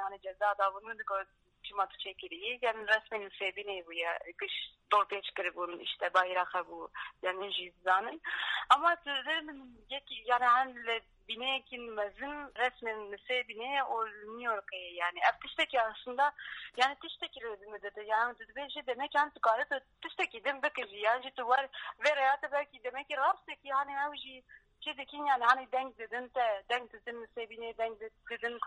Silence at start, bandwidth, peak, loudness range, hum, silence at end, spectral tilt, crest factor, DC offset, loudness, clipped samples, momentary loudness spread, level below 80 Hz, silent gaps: 0 s; 11 kHz; -10 dBFS; 4 LU; none; 0 s; -1.5 dB/octave; 26 dB; under 0.1%; -34 LUFS; under 0.1%; 13 LU; -72 dBFS; none